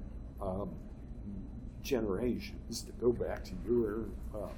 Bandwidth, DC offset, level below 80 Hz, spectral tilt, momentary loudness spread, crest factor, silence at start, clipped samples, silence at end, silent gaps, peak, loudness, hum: 18 kHz; under 0.1%; -46 dBFS; -6 dB/octave; 14 LU; 18 dB; 0 s; under 0.1%; 0 s; none; -20 dBFS; -37 LUFS; none